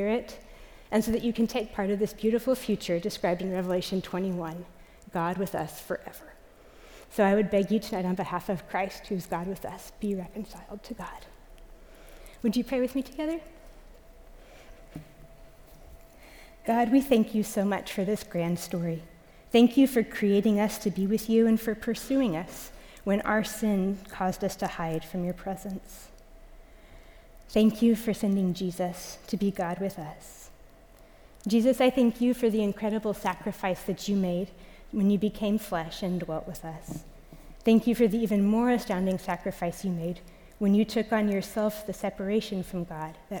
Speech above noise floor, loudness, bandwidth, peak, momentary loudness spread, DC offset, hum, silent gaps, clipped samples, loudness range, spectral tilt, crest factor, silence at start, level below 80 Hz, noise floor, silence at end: 26 dB; -28 LUFS; over 20 kHz; -10 dBFS; 16 LU; under 0.1%; none; none; under 0.1%; 8 LU; -6 dB/octave; 18 dB; 0 s; -52 dBFS; -53 dBFS; 0 s